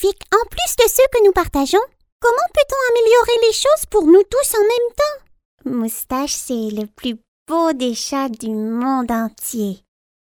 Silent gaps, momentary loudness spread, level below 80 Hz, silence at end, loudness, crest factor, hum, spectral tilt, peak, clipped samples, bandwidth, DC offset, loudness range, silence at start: 2.12-2.20 s, 5.45-5.58 s, 7.28-7.46 s; 13 LU; -42 dBFS; 0.65 s; -17 LUFS; 16 dB; none; -3 dB/octave; 0 dBFS; under 0.1%; over 20 kHz; under 0.1%; 7 LU; 0 s